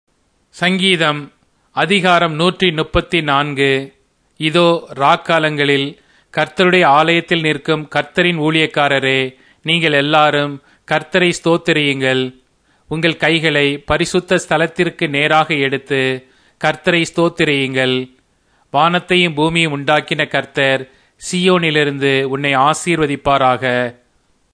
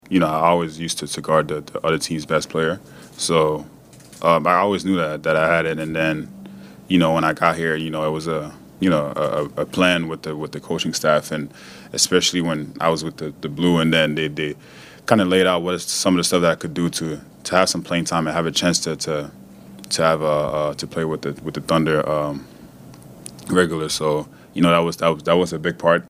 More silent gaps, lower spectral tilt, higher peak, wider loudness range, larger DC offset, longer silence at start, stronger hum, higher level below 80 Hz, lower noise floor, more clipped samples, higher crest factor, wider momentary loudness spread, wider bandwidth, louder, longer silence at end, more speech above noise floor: neither; about the same, -5 dB/octave vs -4.5 dB/octave; about the same, 0 dBFS vs 0 dBFS; about the same, 2 LU vs 3 LU; neither; first, 0.55 s vs 0.1 s; neither; first, -44 dBFS vs -54 dBFS; first, -58 dBFS vs -42 dBFS; neither; about the same, 16 dB vs 20 dB; second, 7 LU vs 12 LU; second, 10.5 kHz vs 16 kHz; first, -14 LUFS vs -20 LUFS; first, 0.6 s vs 0.05 s; first, 44 dB vs 22 dB